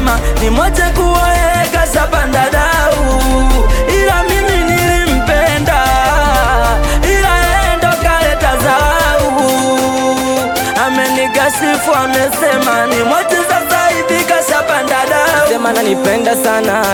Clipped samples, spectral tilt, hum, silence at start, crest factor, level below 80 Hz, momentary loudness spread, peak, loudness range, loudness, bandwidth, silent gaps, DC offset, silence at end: under 0.1%; -4 dB/octave; none; 0 s; 10 dB; -18 dBFS; 2 LU; 0 dBFS; 1 LU; -11 LUFS; 19 kHz; none; under 0.1%; 0 s